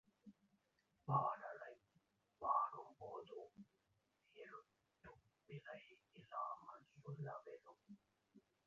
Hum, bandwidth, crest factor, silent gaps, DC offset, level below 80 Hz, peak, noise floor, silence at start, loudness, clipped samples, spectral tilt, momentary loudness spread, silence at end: none; 7.2 kHz; 24 dB; none; under 0.1%; -86 dBFS; -26 dBFS; -84 dBFS; 0.25 s; -47 LUFS; under 0.1%; -6 dB/octave; 26 LU; 0.25 s